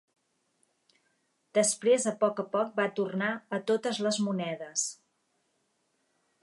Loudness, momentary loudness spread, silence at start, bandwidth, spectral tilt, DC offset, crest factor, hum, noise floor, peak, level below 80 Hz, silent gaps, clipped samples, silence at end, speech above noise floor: -29 LUFS; 7 LU; 1.55 s; 11.5 kHz; -3.5 dB/octave; under 0.1%; 20 dB; none; -75 dBFS; -12 dBFS; -84 dBFS; none; under 0.1%; 1.5 s; 46 dB